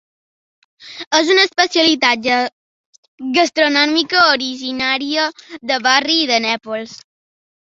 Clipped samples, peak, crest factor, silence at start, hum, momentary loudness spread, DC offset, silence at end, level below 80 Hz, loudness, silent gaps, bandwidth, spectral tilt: under 0.1%; 0 dBFS; 18 dB; 0.8 s; none; 14 LU; under 0.1%; 0.75 s; -62 dBFS; -14 LUFS; 1.07-1.11 s, 2.52-3.18 s; 7.8 kHz; -1.5 dB/octave